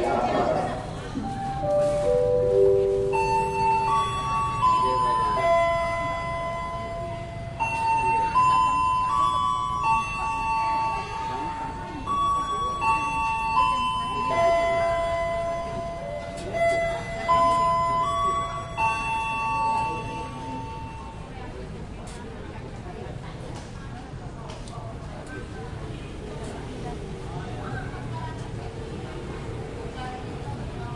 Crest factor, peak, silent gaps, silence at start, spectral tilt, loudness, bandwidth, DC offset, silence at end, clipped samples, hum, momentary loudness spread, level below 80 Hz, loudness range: 16 dB; -10 dBFS; none; 0 s; -5.5 dB/octave; -25 LUFS; 11.5 kHz; under 0.1%; 0 s; under 0.1%; none; 16 LU; -42 dBFS; 14 LU